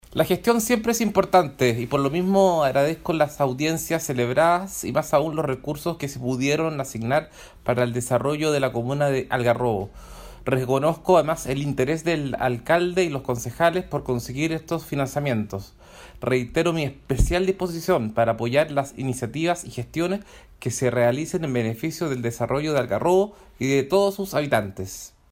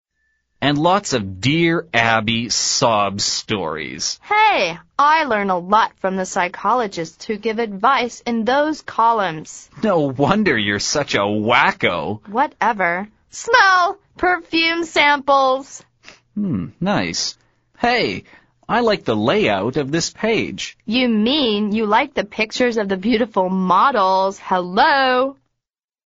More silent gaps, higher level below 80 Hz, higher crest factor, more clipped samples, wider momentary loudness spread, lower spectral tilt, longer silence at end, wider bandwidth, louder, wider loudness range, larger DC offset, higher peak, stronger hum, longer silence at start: neither; first, -42 dBFS vs -52 dBFS; about the same, 20 dB vs 18 dB; neither; about the same, 9 LU vs 9 LU; first, -5.5 dB/octave vs -2.5 dB/octave; second, 0.25 s vs 0.75 s; first, 16 kHz vs 8 kHz; second, -23 LUFS vs -18 LUFS; about the same, 4 LU vs 3 LU; neither; second, -4 dBFS vs 0 dBFS; neither; second, 0.1 s vs 0.6 s